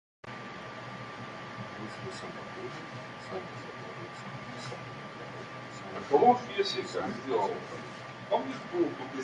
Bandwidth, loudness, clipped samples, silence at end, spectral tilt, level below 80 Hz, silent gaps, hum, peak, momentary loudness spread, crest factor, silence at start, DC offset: 11 kHz; -34 LUFS; under 0.1%; 0 s; -5 dB/octave; -70 dBFS; none; none; -10 dBFS; 13 LU; 24 dB; 0.25 s; under 0.1%